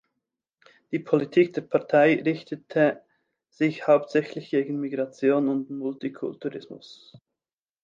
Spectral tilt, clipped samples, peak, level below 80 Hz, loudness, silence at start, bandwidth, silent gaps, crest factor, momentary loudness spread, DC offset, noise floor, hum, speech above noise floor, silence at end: -7.5 dB/octave; under 0.1%; -6 dBFS; -78 dBFS; -25 LUFS; 0.9 s; 7.4 kHz; none; 20 dB; 13 LU; under 0.1%; under -90 dBFS; none; over 66 dB; 0.9 s